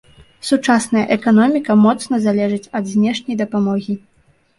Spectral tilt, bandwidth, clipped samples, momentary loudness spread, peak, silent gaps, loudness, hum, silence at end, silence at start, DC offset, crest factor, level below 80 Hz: -5.5 dB/octave; 11.5 kHz; under 0.1%; 9 LU; -2 dBFS; none; -16 LUFS; none; 0.6 s; 0.45 s; under 0.1%; 14 dB; -58 dBFS